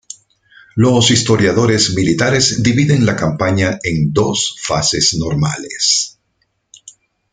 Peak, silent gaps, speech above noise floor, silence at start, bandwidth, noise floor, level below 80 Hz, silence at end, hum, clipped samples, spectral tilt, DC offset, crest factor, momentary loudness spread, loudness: 0 dBFS; none; 52 dB; 0.75 s; 9.6 kHz; -65 dBFS; -42 dBFS; 0.4 s; none; under 0.1%; -4 dB/octave; under 0.1%; 16 dB; 6 LU; -14 LUFS